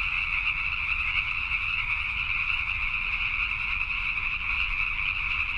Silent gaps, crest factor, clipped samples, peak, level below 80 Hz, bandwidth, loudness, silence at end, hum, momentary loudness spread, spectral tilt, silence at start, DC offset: none; 16 dB; under 0.1%; -12 dBFS; -40 dBFS; 10 kHz; -26 LUFS; 0 s; none; 1 LU; -3 dB/octave; 0 s; under 0.1%